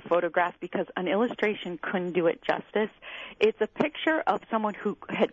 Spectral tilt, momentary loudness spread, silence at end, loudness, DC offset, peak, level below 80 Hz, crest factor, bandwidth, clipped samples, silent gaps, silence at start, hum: -6.5 dB/octave; 7 LU; 0.05 s; -28 LUFS; under 0.1%; -10 dBFS; -68 dBFS; 18 dB; 7.4 kHz; under 0.1%; none; 0.05 s; none